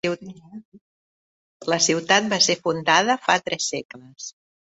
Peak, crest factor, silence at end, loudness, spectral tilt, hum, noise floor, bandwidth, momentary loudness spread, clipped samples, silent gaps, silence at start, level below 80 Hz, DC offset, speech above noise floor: -2 dBFS; 22 dB; 0.4 s; -20 LUFS; -2 dB/octave; none; under -90 dBFS; 8.4 kHz; 19 LU; under 0.1%; 0.65-0.72 s, 0.81-1.60 s, 3.85-3.89 s; 0.05 s; -66 dBFS; under 0.1%; over 68 dB